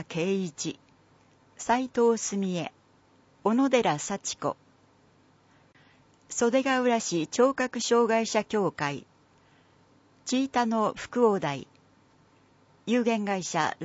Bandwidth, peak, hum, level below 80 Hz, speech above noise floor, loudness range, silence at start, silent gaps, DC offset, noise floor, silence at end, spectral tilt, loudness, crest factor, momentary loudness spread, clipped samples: 8 kHz; -10 dBFS; none; -68 dBFS; 35 dB; 4 LU; 0 s; none; under 0.1%; -62 dBFS; 0 s; -4 dB/octave; -27 LUFS; 18 dB; 12 LU; under 0.1%